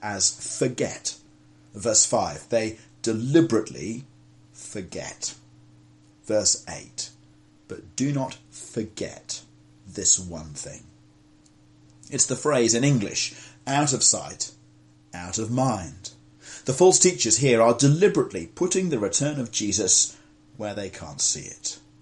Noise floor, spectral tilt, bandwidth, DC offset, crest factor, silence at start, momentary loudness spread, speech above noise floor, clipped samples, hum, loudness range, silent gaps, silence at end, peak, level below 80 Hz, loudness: -56 dBFS; -3.5 dB/octave; 11.5 kHz; under 0.1%; 22 dB; 0 s; 18 LU; 32 dB; under 0.1%; none; 9 LU; none; 0.25 s; -2 dBFS; -62 dBFS; -23 LUFS